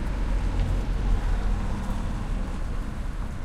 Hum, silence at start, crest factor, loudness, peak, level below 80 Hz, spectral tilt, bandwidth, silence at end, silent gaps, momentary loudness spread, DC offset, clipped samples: none; 0 s; 14 dB; -31 LUFS; -12 dBFS; -26 dBFS; -7 dB/octave; 10.5 kHz; 0 s; none; 6 LU; under 0.1%; under 0.1%